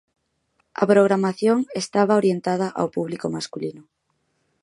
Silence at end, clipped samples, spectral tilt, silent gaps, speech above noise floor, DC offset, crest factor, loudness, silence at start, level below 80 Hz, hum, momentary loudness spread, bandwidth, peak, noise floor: 0.8 s; under 0.1%; -6 dB/octave; none; 50 dB; under 0.1%; 20 dB; -21 LUFS; 0.8 s; -68 dBFS; none; 13 LU; 11.5 kHz; -2 dBFS; -71 dBFS